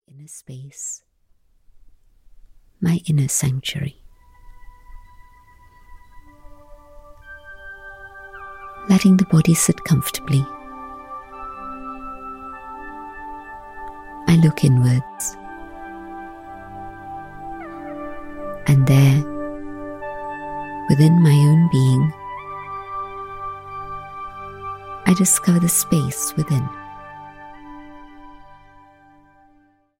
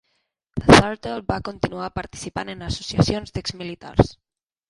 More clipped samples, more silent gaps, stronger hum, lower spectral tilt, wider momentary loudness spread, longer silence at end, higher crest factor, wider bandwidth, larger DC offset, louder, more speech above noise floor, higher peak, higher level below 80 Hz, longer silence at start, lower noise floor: neither; neither; neither; about the same, -5.5 dB/octave vs -5.5 dB/octave; first, 23 LU vs 17 LU; first, 1.7 s vs 0.55 s; about the same, 18 dB vs 22 dB; first, 16.5 kHz vs 11.5 kHz; neither; first, -18 LUFS vs -21 LUFS; second, 41 dB vs 51 dB; about the same, -2 dBFS vs 0 dBFS; second, -46 dBFS vs -38 dBFS; second, 0.15 s vs 0.55 s; second, -58 dBFS vs -72 dBFS